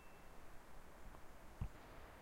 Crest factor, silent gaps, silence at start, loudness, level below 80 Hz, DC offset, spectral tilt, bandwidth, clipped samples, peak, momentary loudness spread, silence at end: 20 dB; none; 0 s; -58 LUFS; -58 dBFS; under 0.1%; -5.5 dB/octave; 16 kHz; under 0.1%; -34 dBFS; 9 LU; 0 s